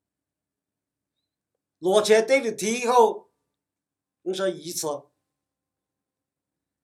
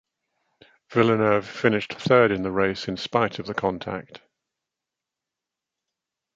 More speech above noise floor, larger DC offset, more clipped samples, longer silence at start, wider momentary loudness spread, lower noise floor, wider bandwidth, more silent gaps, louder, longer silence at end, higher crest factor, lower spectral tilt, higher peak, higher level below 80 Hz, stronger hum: about the same, 66 dB vs 64 dB; neither; neither; first, 1.8 s vs 0.9 s; first, 15 LU vs 10 LU; about the same, -88 dBFS vs -87 dBFS; first, 15.5 kHz vs 7.8 kHz; neither; about the same, -23 LUFS vs -23 LUFS; second, 1.85 s vs 2.2 s; about the same, 22 dB vs 22 dB; second, -3 dB/octave vs -6.5 dB/octave; about the same, -6 dBFS vs -4 dBFS; second, -86 dBFS vs -58 dBFS; neither